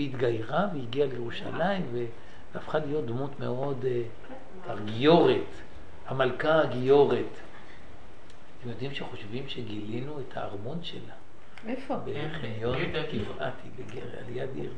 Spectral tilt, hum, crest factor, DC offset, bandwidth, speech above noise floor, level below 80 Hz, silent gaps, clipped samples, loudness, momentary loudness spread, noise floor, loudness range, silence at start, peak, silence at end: -7.5 dB/octave; none; 22 dB; 2%; 9.6 kHz; 22 dB; -56 dBFS; none; under 0.1%; -30 LUFS; 21 LU; -52 dBFS; 12 LU; 0 s; -8 dBFS; 0 s